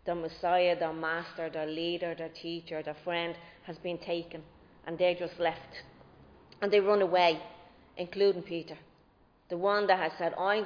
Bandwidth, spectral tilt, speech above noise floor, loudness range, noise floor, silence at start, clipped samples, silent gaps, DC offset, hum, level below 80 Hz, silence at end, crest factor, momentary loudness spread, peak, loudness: 5.2 kHz; -6 dB/octave; 33 dB; 6 LU; -64 dBFS; 0.05 s; under 0.1%; none; under 0.1%; none; -66 dBFS; 0 s; 20 dB; 20 LU; -12 dBFS; -31 LUFS